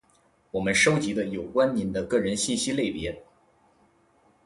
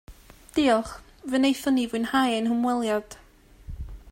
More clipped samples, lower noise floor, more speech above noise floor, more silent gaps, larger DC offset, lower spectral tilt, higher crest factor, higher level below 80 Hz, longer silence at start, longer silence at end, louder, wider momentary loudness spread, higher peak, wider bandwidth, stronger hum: neither; first, -64 dBFS vs -47 dBFS; first, 38 dB vs 23 dB; neither; neither; about the same, -4 dB/octave vs -4.5 dB/octave; about the same, 20 dB vs 16 dB; second, -54 dBFS vs -46 dBFS; first, 0.55 s vs 0.1 s; first, 1.25 s vs 0 s; about the same, -25 LUFS vs -25 LUFS; second, 13 LU vs 19 LU; about the same, -8 dBFS vs -10 dBFS; second, 11.5 kHz vs 16.5 kHz; neither